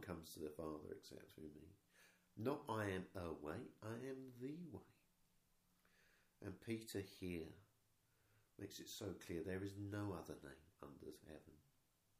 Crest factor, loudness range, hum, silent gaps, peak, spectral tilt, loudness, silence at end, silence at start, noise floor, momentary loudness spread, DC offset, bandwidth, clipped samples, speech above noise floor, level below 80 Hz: 22 dB; 5 LU; none; none; -30 dBFS; -5.5 dB/octave; -51 LUFS; 0.6 s; 0 s; -80 dBFS; 14 LU; under 0.1%; 15.5 kHz; under 0.1%; 29 dB; -76 dBFS